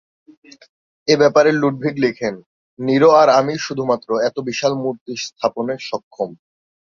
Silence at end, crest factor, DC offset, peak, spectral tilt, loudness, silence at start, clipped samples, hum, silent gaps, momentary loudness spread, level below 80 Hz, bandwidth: 0.5 s; 18 dB; under 0.1%; 0 dBFS; -5 dB/octave; -17 LUFS; 1.05 s; under 0.1%; none; 2.46-2.77 s, 5.01-5.06 s, 6.03-6.11 s; 15 LU; -62 dBFS; 7.4 kHz